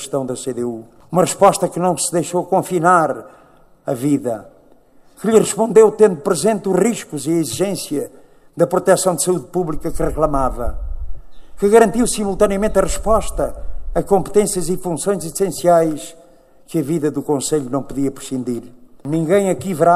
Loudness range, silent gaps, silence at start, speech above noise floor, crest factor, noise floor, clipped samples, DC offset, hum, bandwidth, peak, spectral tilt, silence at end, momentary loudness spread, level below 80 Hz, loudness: 3 LU; none; 0 s; 31 dB; 18 dB; -48 dBFS; under 0.1%; under 0.1%; none; 15 kHz; 0 dBFS; -5 dB/octave; 0 s; 12 LU; -34 dBFS; -17 LUFS